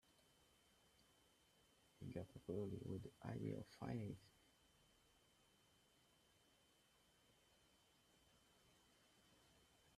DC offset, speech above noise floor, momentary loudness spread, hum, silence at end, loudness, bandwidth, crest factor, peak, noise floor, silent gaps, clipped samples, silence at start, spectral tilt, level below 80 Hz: under 0.1%; 26 dB; 6 LU; none; 0.1 s; -52 LUFS; 13.5 kHz; 22 dB; -36 dBFS; -77 dBFS; none; under 0.1%; 1 s; -7 dB/octave; -80 dBFS